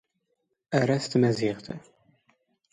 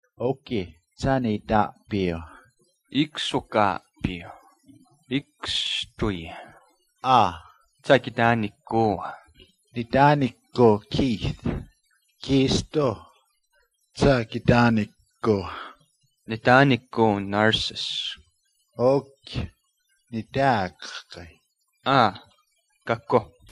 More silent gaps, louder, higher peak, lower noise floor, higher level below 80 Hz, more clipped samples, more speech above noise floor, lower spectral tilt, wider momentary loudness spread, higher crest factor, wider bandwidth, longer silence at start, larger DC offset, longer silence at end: neither; second, -26 LUFS vs -23 LUFS; second, -8 dBFS vs -2 dBFS; first, -77 dBFS vs -70 dBFS; second, -66 dBFS vs -46 dBFS; neither; first, 52 dB vs 47 dB; about the same, -6.5 dB/octave vs -6 dB/octave; about the same, 17 LU vs 18 LU; about the same, 20 dB vs 22 dB; about the same, 11 kHz vs 11.5 kHz; first, 0.7 s vs 0.2 s; neither; first, 0.95 s vs 0.25 s